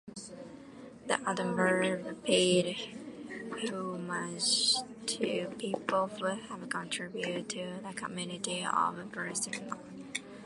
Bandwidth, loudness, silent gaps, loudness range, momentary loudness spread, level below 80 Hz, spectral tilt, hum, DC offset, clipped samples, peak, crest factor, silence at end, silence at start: 11.5 kHz; -33 LUFS; none; 5 LU; 16 LU; -72 dBFS; -3 dB/octave; none; under 0.1%; under 0.1%; -12 dBFS; 22 dB; 0 s; 0.05 s